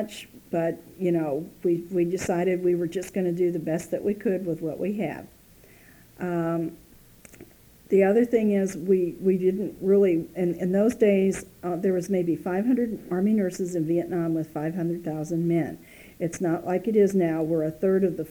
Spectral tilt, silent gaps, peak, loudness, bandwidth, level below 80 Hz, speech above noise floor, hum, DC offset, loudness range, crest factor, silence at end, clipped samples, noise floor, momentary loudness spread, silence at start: -7.5 dB/octave; none; -8 dBFS; -25 LUFS; over 20 kHz; -58 dBFS; 28 dB; none; under 0.1%; 6 LU; 16 dB; 0 s; under 0.1%; -53 dBFS; 9 LU; 0 s